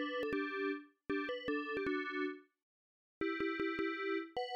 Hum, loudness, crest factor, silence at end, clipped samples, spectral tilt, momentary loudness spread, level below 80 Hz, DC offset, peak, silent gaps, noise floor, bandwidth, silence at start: none; -39 LUFS; 12 dB; 0 s; under 0.1%; -5.5 dB/octave; 5 LU; -70 dBFS; under 0.1%; -28 dBFS; 2.63-3.21 s; under -90 dBFS; 8.4 kHz; 0 s